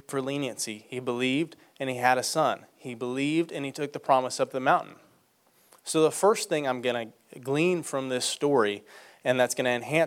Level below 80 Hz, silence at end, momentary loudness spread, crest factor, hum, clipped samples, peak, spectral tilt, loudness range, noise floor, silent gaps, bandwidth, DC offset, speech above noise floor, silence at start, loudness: -78 dBFS; 0 s; 11 LU; 20 dB; none; under 0.1%; -8 dBFS; -4 dB/octave; 2 LU; -65 dBFS; none; 16.5 kHz; under 0.1%; 37 dB; 0.1 s; -27 LUFS